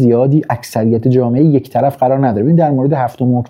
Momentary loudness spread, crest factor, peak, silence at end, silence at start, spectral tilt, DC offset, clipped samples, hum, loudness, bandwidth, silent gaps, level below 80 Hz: 4 LU; 10 dB; -2 dBFS; 0.05 s; 0 s; -9 dB/octave; under 0.1%; under 0.1%; none; -13 LUFS; 16 kHz; none; -56 dBFS